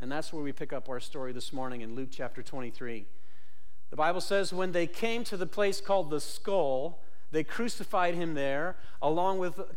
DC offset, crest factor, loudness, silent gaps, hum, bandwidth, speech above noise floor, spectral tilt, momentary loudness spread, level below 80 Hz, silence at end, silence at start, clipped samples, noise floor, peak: 4%; 16 dB; -33 LUFS; none; none; 16.5 kHz; 32 dB; -4.5 dB/octave; 11 LU; -64 dBFS; 0 s; 0 s; under 0.1%; -64 dBFS; -14 dBFS